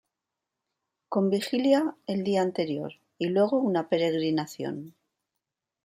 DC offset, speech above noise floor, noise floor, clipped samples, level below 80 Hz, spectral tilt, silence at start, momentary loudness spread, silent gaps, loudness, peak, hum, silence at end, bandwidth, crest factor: under 0.1%; 60 dB; -87 dBFS; under 0.1%; -76 dBFS; -6.5 dB/octave; 1.1 s; 11 LU; none; -27 LUFS; -10 dBFS; none; 0.95 s; 15.5 kHz; 18 dB